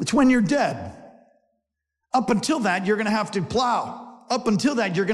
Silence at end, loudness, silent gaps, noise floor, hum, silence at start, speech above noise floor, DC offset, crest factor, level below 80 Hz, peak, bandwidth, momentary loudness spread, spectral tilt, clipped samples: 0 s; -22 LUFS; none; -82 dBFS; none; 0 s; 60 dB; under 0.1%; 14 dB; -56 dBFS; -10 dBFS; 12.5 kHz; 11 LU; -5 dB/octave; under 0.1%